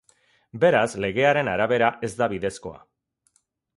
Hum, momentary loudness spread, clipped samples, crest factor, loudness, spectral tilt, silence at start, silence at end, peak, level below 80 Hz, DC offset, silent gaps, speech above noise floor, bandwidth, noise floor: none; 15 LU; under 0.1%; 18 dB; -22 LUFS; -5.5 dB/octave; 0.55 s; 1 s; -6 dBFS; -56 dBFS; under 0.1%; none; 46 dB; 11.5 kHz; -68 dBFS